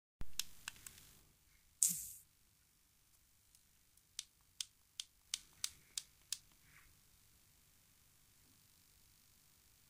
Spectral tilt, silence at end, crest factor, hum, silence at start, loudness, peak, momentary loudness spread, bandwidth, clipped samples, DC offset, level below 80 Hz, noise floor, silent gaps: 1 dB/octave; 3.05 s; 42 dB; none; 0.2 s; -44 LUFS; -8 dBFS; 28 LU; 15.5 kHz; under 0.1%; under 0.1%; -68 dBFS; -74 dBFS; none